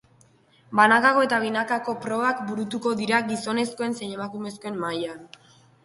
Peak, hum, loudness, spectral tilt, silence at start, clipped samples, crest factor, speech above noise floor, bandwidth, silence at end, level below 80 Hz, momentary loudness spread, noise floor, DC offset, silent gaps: -2 dBFS; none; -24 LUFS; -4.5 dB/octave; 0.7 s; under 0.1%; 22 dB; 34 dB; 11.5 kHz; 0.6 s; -68 dBFS; 15 LU; -58 dBFS; under 0.1%; none